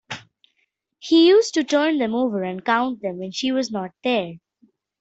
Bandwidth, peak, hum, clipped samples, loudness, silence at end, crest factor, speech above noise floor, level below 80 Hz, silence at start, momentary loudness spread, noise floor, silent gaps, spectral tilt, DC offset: 8 kHz; -4 dBFS; none; under 0.1%; -20 LUFS; 0.65 s; 18 dB; 51 dB; -68 dBFS; 0.1 s; 16 LU; -71 dBFS; none; -4.5 dB/octave; under 0.1%